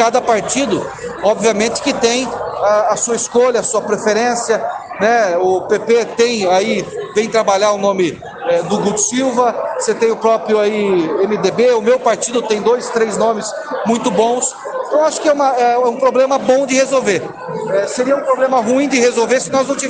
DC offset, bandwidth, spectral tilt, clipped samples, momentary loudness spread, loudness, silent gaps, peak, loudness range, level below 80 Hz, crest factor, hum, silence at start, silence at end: under 0.1%; 10 kHz; -3.5 dB/octave; under 0.1%; 6 LU; -15 LUFS; none; 0 dBFS; 1 LU; -54 dBFS; 14 dB; none; 0 s; 0 s